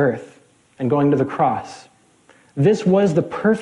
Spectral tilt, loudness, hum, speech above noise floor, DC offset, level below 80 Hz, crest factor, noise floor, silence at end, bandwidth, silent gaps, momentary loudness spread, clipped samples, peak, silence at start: -8 dB/octave; -19 LUFS; none; 36 dB; under 0.1%; -58 dBFS; 14 dB; -54 dBFS; 0 s; 11 kHz; none; 14 LU; under 0.1%; -4 dBFS; 0 s